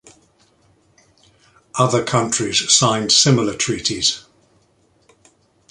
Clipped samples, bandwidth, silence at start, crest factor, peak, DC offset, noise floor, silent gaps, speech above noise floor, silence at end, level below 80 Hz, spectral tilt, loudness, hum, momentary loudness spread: under 0.1%; 11.5 kHz; 1.75 s; 20 dB; 0 dBFS; under 0.1%; -59 dBFS; none; 42 dB; 1.5 s; -54 dBFS; -3 dB/octave; -16 LUFS; none; 7 LU